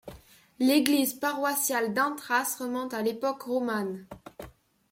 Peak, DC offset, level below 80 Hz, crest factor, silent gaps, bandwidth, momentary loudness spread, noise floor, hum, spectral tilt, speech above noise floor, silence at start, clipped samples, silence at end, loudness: -6 dBFS; under 0.1%; -64 dBFS; 24 dB; none; 16.5 kHz; 21 LU; -53 dBFS; none; -3 dB/octave; 25 dB; 0.05 s; under 0.1%; 0.4 s; -28 LUFS